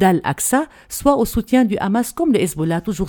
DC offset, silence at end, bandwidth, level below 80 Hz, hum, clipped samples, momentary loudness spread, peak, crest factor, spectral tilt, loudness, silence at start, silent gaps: under 0.1%; 0 s; 19 kHz; -38 dBFS; none; under 0.1%; 4 LU; 0 dBFS; 18 dB; -5 dB/octave; -18 LUFS; 0 s; none